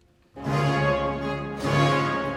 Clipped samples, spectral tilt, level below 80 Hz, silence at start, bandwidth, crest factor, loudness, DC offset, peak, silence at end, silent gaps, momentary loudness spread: under 0.1%; -6.5 dB/octave; -46 dBFS; 0.35 s; 12 kHz; 14 dB; -24 LUFS; under 0.1%; -10 dBFS; 0 s; none; 8 LU